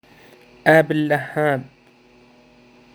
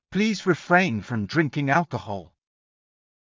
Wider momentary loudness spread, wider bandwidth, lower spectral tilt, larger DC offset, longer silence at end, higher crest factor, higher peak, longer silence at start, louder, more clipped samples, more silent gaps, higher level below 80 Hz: second, 7 LU vs 12 LU; first, over 20 kHz vs 7.6 kHz; about the same, -7 dB/octave vs -6 dB/octave; neither; first, 1.3 s vs 1 s; about the same, 22 dB vs 20 dB; first, 0 dBFS vs -6 dBFS; first, 0.65 s vs 0.1 s; first, -18 LUFS vs -23 LUFS; neither; neither; second, -64 dBFS vs -56 dBFS